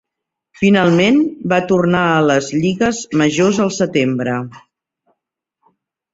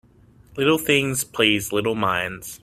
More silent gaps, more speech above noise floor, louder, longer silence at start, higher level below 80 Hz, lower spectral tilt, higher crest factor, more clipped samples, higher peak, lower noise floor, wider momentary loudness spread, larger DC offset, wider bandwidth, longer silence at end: neither; first, 66 dB vs 30 dB; first, -15 LUFS vs -21 LUFS; about the same, 0.6 s vs 0.55 s; about the same, -52 dBFS vs -54 dBFS; first, -5.5 dB/octave vs -3.5 dB/octave; second, 14 dB vs 20 dB; neither; about the same, -2 dBFS vs -2 dBFS; first, -81 dBFS vs -52 dBFS; about the same, 6 LU vs 7 LU; neither; second, 8 kHz vs 16 kHz; first, 1.55 s vs 0.05 s